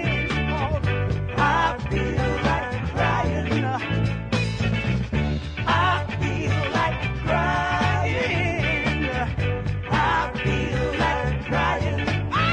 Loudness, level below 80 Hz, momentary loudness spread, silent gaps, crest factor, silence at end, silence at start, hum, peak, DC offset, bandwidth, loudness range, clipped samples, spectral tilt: -23 LUFS; -34 dBFS; 4 LU; none; 14 dB; 0 s; 0 s; none; -8 dBFS; under 0.1%; 9.8 kHz; 1 LU; under 0.1%; -6.5 dB/octave